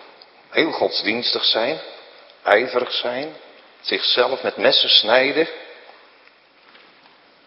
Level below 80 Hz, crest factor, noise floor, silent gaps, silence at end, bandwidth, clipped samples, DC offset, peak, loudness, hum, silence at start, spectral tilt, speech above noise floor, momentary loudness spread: -74 dBFS; 22 dB; -52 dBFS; none; 1.65 s; 5.8 kHz; under 0.1%; under 0.1%; 0 dBFS; -18 LUFS; none; 0 s; -5 dB/octave; 33 dB; 16 LU